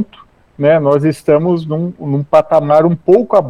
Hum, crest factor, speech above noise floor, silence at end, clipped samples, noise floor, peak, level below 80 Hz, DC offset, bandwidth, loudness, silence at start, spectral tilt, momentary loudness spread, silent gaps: none; 12 dB; 32 dB; 0 s; under 0.1%; -44 dBFS; 0 dBFS; -52 dBFS; under 0.1%; 12 kHz; -12 LUFS; 0 s; -8.5 dB/octave; 9 LU; none